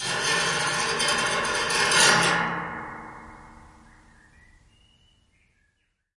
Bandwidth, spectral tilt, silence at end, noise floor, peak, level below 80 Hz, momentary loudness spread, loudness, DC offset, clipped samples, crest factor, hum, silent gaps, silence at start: 11.5 kHz; -1 dB/octave; 2.65 s; -72 dBFS; -4 dBFS; -56 dBFS; 21 LU; -22 LUFS; under 0.1%; under 0.1%; 22 dB; none; none; 0 s